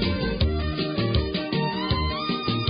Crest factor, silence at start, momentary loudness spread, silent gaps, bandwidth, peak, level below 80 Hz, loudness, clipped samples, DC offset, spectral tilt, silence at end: 16 dB; 0 s; 2 LU; none; 5.2 kHz; -10 dBFS; -32 dBFS; -25 LUFS; under 0.1%; under 0.1%; -10.5 dB/octave; 0 s